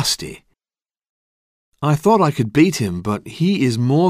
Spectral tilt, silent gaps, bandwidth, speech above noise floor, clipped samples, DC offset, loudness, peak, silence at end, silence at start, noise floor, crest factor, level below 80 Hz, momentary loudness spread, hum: -5.5 dB/octave; 1.09-1.72 s; 15.5 kHz; over 73 dB; under 0.1%; under 0.1%; -18 LUFS; -2 dBFS; 0 s; 0 s; under -90 dBFS; 16 dB; -50 dBFS; 9 LU; none